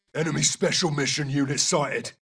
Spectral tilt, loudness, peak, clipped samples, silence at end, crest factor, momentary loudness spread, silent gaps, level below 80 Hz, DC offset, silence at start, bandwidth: -3 dB/octave; -23 LUFS; -8 dBFS; under 0.1%; 0.1 s; 18 dB; 4 LU; none; -60 dBFS; under 0.1%; 0.15 s; 11 kHz